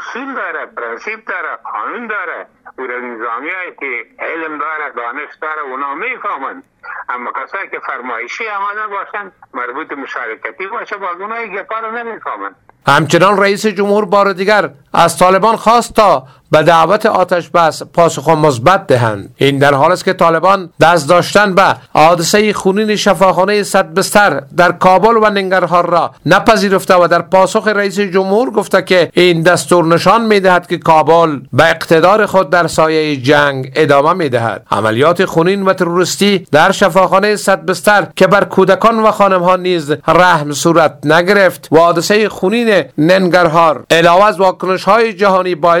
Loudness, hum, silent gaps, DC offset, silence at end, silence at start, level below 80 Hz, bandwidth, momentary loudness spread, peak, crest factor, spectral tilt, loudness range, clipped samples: -11 LUFS; none; none; under 0.1%; 0 s; 0 s; -46 dBFS; 18 kHz; 13 LU; 0 dBFS; 12 dB; -4.5 dB/octave; 11 LU; 0.4%